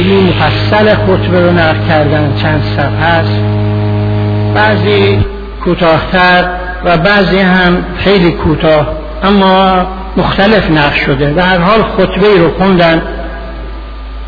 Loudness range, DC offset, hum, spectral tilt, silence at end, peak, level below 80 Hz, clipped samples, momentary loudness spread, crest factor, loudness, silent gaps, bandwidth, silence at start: 2 LU; under 0.1%; none; -8.5 dB/octave; 0 s; 0 dBFS; -24 dBFS; 0.2%; 8 LU; 8 dB; -9 LUFS; none; 5.4 kHz; 0 s